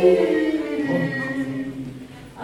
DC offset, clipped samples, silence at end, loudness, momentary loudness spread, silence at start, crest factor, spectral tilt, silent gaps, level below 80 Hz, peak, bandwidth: under 0.1%; under 0.1%; 0 s; -23 LUFS; 17 LU; 0 s; 18 dB; -7 dB/octave; none; -54 dBFS; -4 dBFS; 12.5 kHz